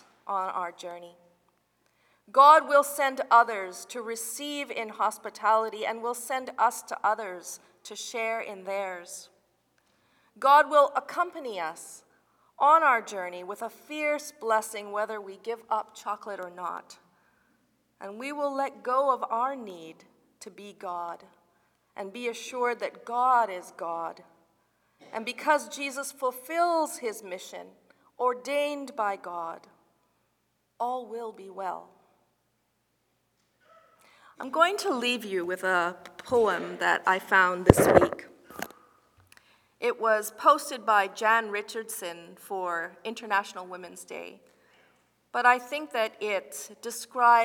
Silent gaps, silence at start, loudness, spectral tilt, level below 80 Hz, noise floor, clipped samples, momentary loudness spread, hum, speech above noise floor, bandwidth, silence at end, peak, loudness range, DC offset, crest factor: none; 0.25 s; -27 LUFS; -4 dB/octave; -54 dBFS; -74 dBFS; under 0.1%; 19 LU; none; 47 dB; 19.5 kHz; 0 s; 0 dBFS; 12 LU; under 0.1%; 28 dB